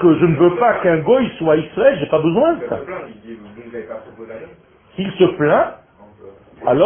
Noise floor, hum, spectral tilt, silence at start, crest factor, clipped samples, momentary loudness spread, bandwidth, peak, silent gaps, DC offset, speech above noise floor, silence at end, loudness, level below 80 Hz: -42 dBFS; none; -12 dB/octave; 0 s; 16 dB; under 0.1%; 21 LU; 3.5 kHz; 0 dBFS; none; under 0.1%; 26 dB; 0 s; -16 LUFS; -50 dBFS